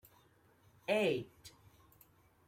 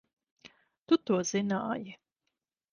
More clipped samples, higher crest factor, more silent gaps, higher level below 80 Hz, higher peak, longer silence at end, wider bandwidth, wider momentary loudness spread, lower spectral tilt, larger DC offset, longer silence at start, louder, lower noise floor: neither; about the same, 20 dB vs 20 dB; second, none vs 0.78-0.86 s; about the same, -76 dBFS vs -74 dBFS; second, -20 dBFS vs -14 dBFS; first, 1 s vs 0.75 s; first, 16.5 kHz vs 10 kHz; first, 25 LU vs 11 LU; about the same, -5 dB/octave vs -5 dB/octave; neither; first, 0.9 s vs 0.45 s; second, -36 LUFS vs -31 LUFS; second, -68 dBFS vs -85 dBFS